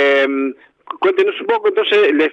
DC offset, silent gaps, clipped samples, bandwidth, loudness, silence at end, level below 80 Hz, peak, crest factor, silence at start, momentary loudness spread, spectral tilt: under 0.1%; none; under 0.1%; 7.4 kHz; -15 LUFS; 0 s; -76 dBFS; -2 dBFS; 14 dB; 0 s; 9 LU; -4 dB/octave